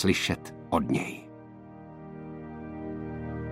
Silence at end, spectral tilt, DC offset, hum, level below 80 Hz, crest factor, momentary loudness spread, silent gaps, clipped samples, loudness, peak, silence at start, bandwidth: 0 s; -5 dB/octave; under 0.1%; none; -54 dBFS; 22 dB; 20 LU; none; under 0.1%; -32 LUFS; -10 dBFS; 0 s; 16 kHz